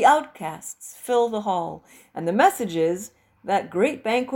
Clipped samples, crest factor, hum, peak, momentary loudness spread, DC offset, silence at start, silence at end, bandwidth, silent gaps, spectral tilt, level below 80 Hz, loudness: under 0.1%; 20 dB; none; -4 dBFS; 17 LU; under 0.1%; 0 s; 0 s; 17 kHz; none; -4.5 dB/octave; -66 dBFS; -23 LUFS